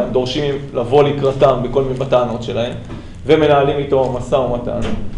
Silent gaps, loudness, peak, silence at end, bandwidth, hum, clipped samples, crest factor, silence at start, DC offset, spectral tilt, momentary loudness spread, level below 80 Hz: none; -16 LUFS; 0 dBFS; 0 s; 10.5 kHz; none; under 0.1%; 14 dB; 0 s; under 0.1%; -7 dB/octave; 9 LU; -34 dBFS